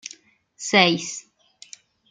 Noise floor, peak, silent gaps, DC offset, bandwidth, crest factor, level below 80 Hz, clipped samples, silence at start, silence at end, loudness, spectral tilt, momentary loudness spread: -50 dBFS; -2 dBFS; none; under 0.1%; 9.6 kHz; 24 dB; -70 dBFS; under 0.1%; 0.05 s; 0.9 s; -19 LUFS; -3 dB/octave; 20 LU